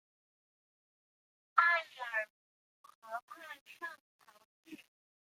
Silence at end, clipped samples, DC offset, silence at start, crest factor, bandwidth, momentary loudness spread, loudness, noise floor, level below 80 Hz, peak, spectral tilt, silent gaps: 0.6 s; under 0.1%; under 0.1%; 1.55 s; 28 dB; 16 kHz; 26 LU; -35 LUFS; under -90 dBFS; under -90 dBFS; -12 dBFS; -1 dB/octave; 2.30-2.84 s, 2.95-3.02 s, 3.22-3.28 s, 3.61-3.66 s, 4.00-4.19 s, 4.45-4.64 s